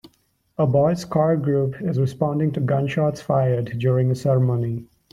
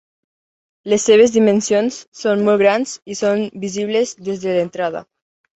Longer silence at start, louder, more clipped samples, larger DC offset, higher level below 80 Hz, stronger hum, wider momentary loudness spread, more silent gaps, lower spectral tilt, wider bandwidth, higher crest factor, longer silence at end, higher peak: second, 0.05 s vs 0.85 s; second, -21 LUFS vs -17 LUFS; neither; neither; first, -54 dBFS vs -60 dBFS; neither; second, 4 LU vs 12 LU; second, none vs 2.07-2.12 s; first, -8.5 dB/octave vs -4.5 dB/octave; first, 11 kHz vs 8.2 kHz; about the same, 16 dB vs 16 dB; second, 0.3 s vs 0.55 s; second, -6 dBFS vs -2 dBFS